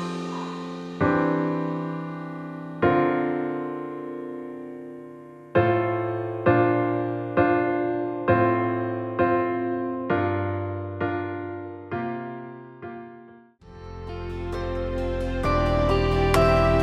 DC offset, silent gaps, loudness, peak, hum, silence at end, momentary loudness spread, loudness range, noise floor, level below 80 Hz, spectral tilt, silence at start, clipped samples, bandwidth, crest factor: under 0.1%; none; -25 LUFS; -6 dBFS; none; 0 s; 17 LU; 10 LU; -49 dBFS; -38 dBFS; -7.5 dB/octave; 0 s; under 0.1%; 14 kHz; 20 dB